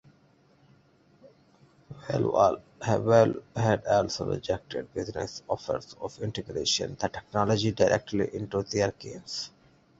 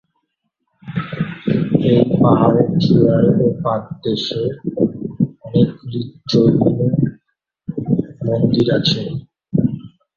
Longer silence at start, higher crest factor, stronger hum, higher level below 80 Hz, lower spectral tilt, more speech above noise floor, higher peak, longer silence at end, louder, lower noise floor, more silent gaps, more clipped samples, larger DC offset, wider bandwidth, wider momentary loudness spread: first, 1.25 s vs 0.85 s; first, 22 dB vs 16 dB; neither; second, -56 dBFS vs -48 dBFS; second, -5 dB/octave vs -8 dB/octave; second, 35 dB vs 57 dB; second, -6 dBFS vs -2 dBFS; first, 0.5 s vs 0.3 s; second, -28 LUFS vs -17 LUFS; second, -62 dBFS vs -72 dBFS; neither; neither; neither; first, 8 kHz vs 7 kHz; about the same, 12 LU vs 13 LU